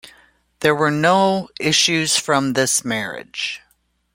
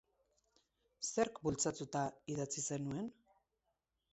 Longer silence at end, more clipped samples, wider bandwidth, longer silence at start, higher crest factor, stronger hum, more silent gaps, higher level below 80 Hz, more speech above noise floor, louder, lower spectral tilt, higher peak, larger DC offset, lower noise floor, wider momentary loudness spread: second, 0.55 s vs 1 s; neither; first, 16.5 kHz vs 8 kHz; second, 0.6 s vs 1 s; about the same, 18 dB vs 22 dB; neither; neither; first, -58 dBFS vs -70 dBFS; about the same, 45 dB vs 46 dB; first, -18 LUFS vs -40 LUFS; second, -3 dB/octave vs -5.5 dB/octave; first, -2 dBFS vs -22 dBFS; neither; second, -63 dBFS vs -86 dBFS; first, 10 LU vs 7 LU